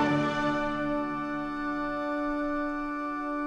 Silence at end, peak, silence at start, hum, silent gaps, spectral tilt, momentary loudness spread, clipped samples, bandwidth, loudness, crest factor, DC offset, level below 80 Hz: 0 s; -14 dBFS; 0 s; none; none; -6.5 dB/octave; 5 LU; under 0.1%; 8.6 kHz; -30 LUFS; 16 dB; under 0.1%; -48 dBFS